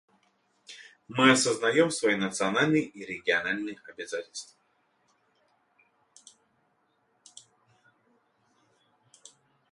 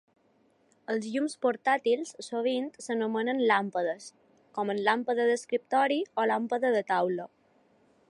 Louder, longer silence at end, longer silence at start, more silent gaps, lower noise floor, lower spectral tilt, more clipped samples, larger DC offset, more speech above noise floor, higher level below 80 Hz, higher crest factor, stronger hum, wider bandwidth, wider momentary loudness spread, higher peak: first, -26 LUFS vs -29 LUFS; first, 5.25 s vs 0.85 s; second, 0.7 s vs 0.9 s; neither; first, -72 dBFS vs -67 dBFS; about the same, -3.5 dB/octave vs -4.5 dB/octave; neither; neither; first, 45 dB vs 39 dB; first, -72 dBFS vs -84 dBFS; first, 24 dB vs 18 dB; neither; about the same, 11.5 kHz vs 11.5 kHz; first, 26 LU vs 9 LU; about the same, -8 dBFS vs -10 dBFS